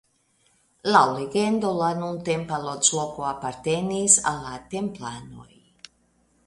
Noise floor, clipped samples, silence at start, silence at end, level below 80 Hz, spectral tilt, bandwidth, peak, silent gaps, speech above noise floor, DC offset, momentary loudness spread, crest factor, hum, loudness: -65 dBFS; under 0.1%; 0.85 s; 1 s; -58 dBFS; -3 dB/octave; 11.5 kHz; -2 dBFS; none; 41 dB; under 0.1%; 15 LU; 24 dB; none; -23 LUFS